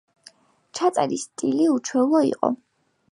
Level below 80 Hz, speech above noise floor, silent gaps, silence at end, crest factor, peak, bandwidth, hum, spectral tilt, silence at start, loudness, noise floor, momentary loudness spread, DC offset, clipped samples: -72 dBFS; 32 dB; none; 0.6 s; 20 dB; -2 dBFS; 11.5 kHz; none; -4.5 dB/octave; 0.75 s; -22 LUFS; -53 dBFS; 7 LU; under 0.1%; under 0.1%